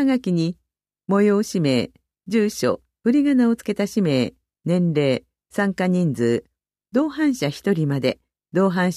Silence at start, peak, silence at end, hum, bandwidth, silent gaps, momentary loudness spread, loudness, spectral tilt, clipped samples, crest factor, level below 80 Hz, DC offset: 0 s; -6 dBFS; 0 s; none; 14.5 kHz; none; 9 LU; -21 LUFS; -6.5 dB/octave; under 0.1%; 14 dB; -60 dBFS; under 0.1%